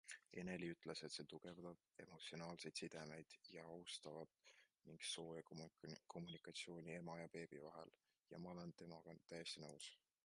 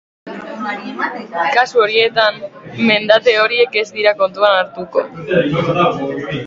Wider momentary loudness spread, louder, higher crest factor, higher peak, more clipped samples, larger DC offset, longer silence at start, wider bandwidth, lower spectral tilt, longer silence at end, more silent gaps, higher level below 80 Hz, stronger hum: second, 9 LU vs 12 LU; second, -55 LUFS vs -15 LUFS; first, 22 dB vs 16 dB; second, -36 dBFS vs 0 dBFS; neither; neither; second, 0.05 s vs 0.25 s; first, 11 kHz vs 7.6 kHz; about the same, -4 dB/octave vs -5 dB/octave; first, 0.3 s vs 0 s; neither; second, -84 dBFS vs -54 dBFS; neither